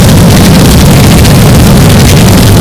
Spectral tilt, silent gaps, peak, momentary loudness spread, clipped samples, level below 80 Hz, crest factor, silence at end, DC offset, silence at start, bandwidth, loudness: -5.5 dB/octave; none; 0 dBFS; 0 LU; 40%; -10 dBFS; 2 dB; 0 s; 3%; 0 s; over 20 kHz; -2 LUFS